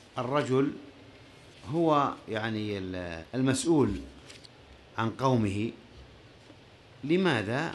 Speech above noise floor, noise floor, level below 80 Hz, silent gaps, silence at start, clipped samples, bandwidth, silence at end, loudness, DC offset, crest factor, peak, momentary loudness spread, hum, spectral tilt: 26 dB; -54 dBFS; -54 dBFS; none; 0.15 s; under 0.1%; 12.5 kHz; 0 s; -29 LUFS; under 0.1%; 18 dB; -12 dBFS; 21 LU; none; -6 dB/octave